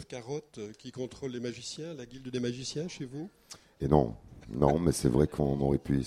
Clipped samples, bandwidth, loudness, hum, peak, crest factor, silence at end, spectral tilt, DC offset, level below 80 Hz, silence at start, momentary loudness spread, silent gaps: under 0.1%; 15 kHz; -31 LUFS; none; -10 dBFS; 22 dB; 0 s; -6.5 dB/octave; under 0.1%; -46 dBFS; 0 s; 16 LU; none